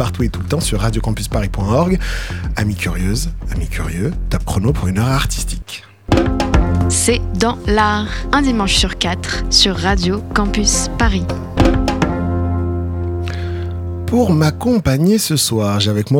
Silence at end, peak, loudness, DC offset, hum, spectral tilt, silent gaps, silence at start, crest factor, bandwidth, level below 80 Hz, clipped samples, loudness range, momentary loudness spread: 0 s; -2 dBFS; -16 LUFS; under 0.1%; none; -4.5 dB/octave; none; 0 s; 14 dB; 17.5 kHz; -24 dBFS; under 0.1%; 4 LU; 9 LU